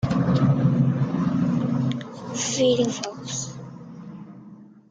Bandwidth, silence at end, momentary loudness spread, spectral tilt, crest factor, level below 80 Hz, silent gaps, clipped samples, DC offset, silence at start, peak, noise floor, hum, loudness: 9.4 kHz; 0.25 s; 20 LU; -6 dB/octave; 16 dB; -52 dBFS; none; under 0.1%; under 0.1%; 0 s; -8 dBFS; -46 dBFS; none; -23 LUFS